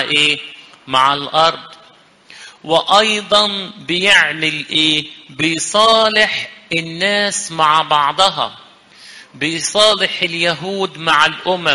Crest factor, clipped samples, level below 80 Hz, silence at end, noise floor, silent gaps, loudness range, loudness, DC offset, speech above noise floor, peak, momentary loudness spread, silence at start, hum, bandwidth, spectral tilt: 16 dB; under 0.1%; -54 dBFS; 0 s; -47 dBFS; none; 3 LU; -14 LUFS; under 0.1%; 32 dB; 0 dBFS; 11 LU; 0 s; none; 11.5 kHz; -2 dB/octave